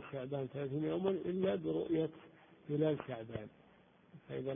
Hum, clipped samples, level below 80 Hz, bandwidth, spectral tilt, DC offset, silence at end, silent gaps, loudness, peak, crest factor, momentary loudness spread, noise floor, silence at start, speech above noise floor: none; under 0.1%; -70 dBFS; 3.7 kHz; -7 dB/octave; under 0.1%; 0 s; none; -39 LUFS; -20 dBFS; 18 dB; 12 LU; -66 dBFS; 0 s; 28 dB